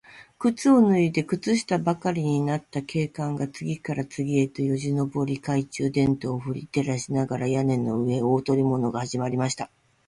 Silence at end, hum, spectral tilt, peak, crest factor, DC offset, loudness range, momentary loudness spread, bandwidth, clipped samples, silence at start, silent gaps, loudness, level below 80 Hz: 0.4 s; none; -6.5 dB/octave; -8 dBFS; 16 dB; under 0.1%; 3 LU; 8 LU; 11.5 kHz; under 0.1%; 0.15 s; none; -25 LUFS; -58 dBFS